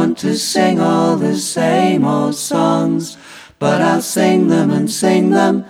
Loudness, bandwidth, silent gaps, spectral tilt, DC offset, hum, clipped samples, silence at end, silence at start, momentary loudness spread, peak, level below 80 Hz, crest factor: -14 LUFS; 16.5 kHz; none; -5 dB/octave; under 0.1%; none; under 0.1%; 0 s; 0 s; 5 LU; 0 dBFS; -60 dBFS; 14 dB